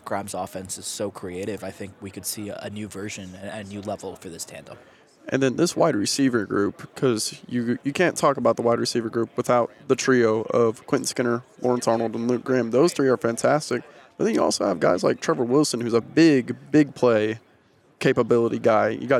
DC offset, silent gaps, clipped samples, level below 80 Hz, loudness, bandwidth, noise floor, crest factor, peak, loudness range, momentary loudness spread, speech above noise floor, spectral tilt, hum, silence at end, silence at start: under 0.1%; none; under 0.1%; -68 dBFS; -23 LUFS; 15.5 kHz; -58 dBFS; 16 dB; -6 dBFS; 11 LU; 14 LU; 36 dB; -5 dB/octave; none; 0 s; 0.05 s